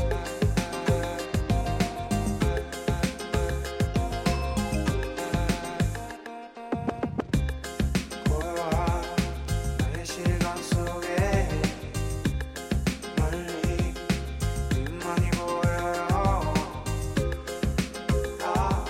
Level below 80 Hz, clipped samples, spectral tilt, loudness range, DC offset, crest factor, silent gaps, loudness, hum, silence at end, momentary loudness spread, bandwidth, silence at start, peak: -34 dBFS; under 0.1%; -5.5 dB/octave; 2 LU; under 0.1%; 16 dB; none; -28 LUFS; none; 0 s; 4 LU; 16.5 kHz; 0 s; -10 dBFS